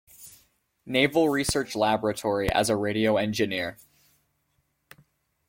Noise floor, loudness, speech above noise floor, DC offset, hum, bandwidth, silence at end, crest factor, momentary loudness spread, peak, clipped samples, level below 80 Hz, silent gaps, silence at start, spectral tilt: -73 dBFS; -25 LUFS; 48 dB; under 0.1%; none; 16.5 kHz; 1.75 s; 20 dB; 8 LU; -8 dBFS; under 0.1%; -50 dBFS; none; 0.2 s; -4 dB/octave